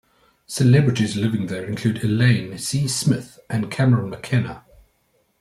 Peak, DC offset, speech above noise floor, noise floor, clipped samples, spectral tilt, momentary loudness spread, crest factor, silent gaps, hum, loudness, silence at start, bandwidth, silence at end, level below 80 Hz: -4 dBFS; under 0.1%; 45 dB; -65 dBFS; under 0.1%; -6 dB/octave; 10 LU; 18 dB; none; none; -21 LUFS; 0.5 s; 13.5 kHz; 0.8 s; -54 dBFS